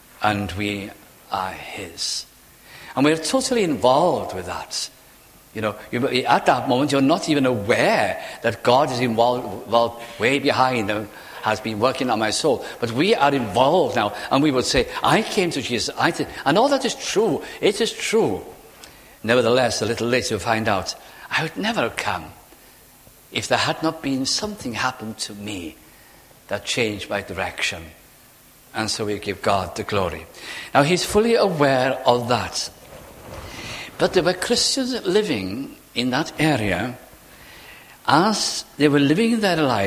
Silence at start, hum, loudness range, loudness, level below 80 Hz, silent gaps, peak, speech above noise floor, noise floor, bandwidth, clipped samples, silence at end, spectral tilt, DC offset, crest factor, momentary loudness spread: 0.2 s; none; 6 LU; -21 LUFS; -48 dBFS; none; 0 dBFS; 29 dB; -50 dBFS; 16 kHz; under 0.1%; 0 s; -4 dB/octave; under 0.1%; 22 dB; 13 LU